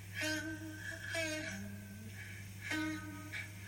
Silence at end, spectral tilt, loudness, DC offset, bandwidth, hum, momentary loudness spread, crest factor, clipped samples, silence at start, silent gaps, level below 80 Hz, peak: 0 s; -3.5 dB/octave; -42 LUFS; under 0.1%; 16.5 kHz; none; 10 LU; 18 dB; under 0.1%; 0 s; none; -66 dBFS; -26 dBFS